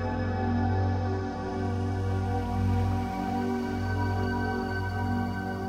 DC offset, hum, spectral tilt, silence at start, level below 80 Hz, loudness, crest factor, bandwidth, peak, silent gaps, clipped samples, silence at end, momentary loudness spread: under 0.1%; none; -8 dB/octave; 0 s; -42 dBFS; -30 LUFS; 12 dB; 8.6 kHz; -18 dBFS; none; under 0.1%; 0 s; 4 LU